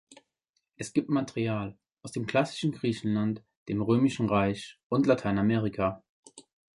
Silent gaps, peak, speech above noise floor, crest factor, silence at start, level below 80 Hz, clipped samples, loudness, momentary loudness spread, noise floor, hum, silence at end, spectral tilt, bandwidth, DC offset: 3.56-3.66 s, 4.83-4.90 s, 6.09-6.23 s; -10 dBFS; 52 dB; 20 dB; 0.8 s; -58 dBFS; under 0.1%; -29 LUFS; 13 LU; -80 dBFS; none; 0.4 s; -6.5 dB/octave; 11.5 kHz; under 0.1%